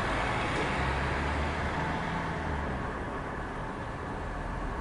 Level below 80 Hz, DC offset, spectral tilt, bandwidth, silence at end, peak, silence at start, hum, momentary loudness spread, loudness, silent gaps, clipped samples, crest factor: -40 dBFS; under 0.1%; -6 dB/octave; 11.5 kHz; 0 s; -18 dBFS; 0 s; none; 7 LU; -33 LUFS; none; under 0.1%; 14 dB